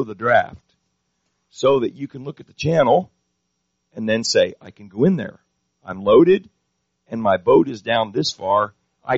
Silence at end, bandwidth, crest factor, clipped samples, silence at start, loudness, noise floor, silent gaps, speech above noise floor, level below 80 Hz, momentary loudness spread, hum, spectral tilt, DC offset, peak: 0 s; 7.6 kHz; 18 dB; under 0.1%; 0 s; -18 LUFS; -73 dBFS; none; 55 dB; -56 dBFS; 18 LU; none; -4.5 dB/octave; under 0.1%; -2 dBFS